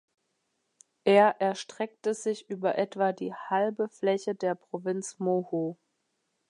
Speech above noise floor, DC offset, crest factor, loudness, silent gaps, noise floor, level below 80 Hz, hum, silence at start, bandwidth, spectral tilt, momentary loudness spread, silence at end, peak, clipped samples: 50 dB; under 0.1%; 20 dB; -29 LUFS; none; -78 dBFS; -82 dBFS; none; 1.05 s; 11 kHz; -5 dB/octave; 11 LU; 0.75 s; -10 dBFS; under 0.1%